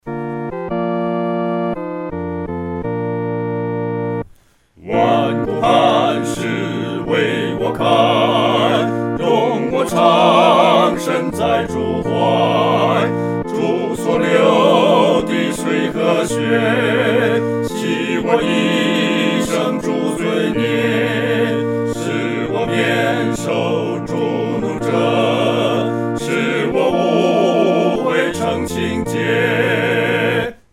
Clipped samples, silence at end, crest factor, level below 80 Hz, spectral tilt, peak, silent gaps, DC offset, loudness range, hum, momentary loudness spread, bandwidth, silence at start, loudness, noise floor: under 0.1%; 0.2 s; 16 dB; -46 dBFS; -5.5 dB/octave; 0 dBFS; none; under 0.1%; 5 LU; none; 8 LU; 16 kHz; 0.05 s; -16 LUFS; -50 dBFS